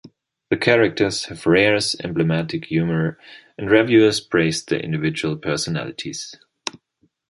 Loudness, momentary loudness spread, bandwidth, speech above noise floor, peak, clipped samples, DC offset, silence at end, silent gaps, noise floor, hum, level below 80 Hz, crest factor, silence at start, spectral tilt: -19 LUFS; 15 LU; 11.5 kHz; 46 dB; -2 dBFS; under 0.1%; under 0.1%; 0.6 s; none; -66 dBFS; none; -52 dBFS; 18 dB; 0.05 s; -5 dB/octave